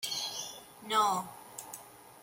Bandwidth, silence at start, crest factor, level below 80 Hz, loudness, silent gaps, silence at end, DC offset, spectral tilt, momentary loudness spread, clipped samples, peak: 17 kHz; 0 s; 20 dB; -78 dBFS; -33 LUFS; none; 0 s; under 0.1%; -1.5 dB/octave; 19 LU; under 0.1%; -16 dBFS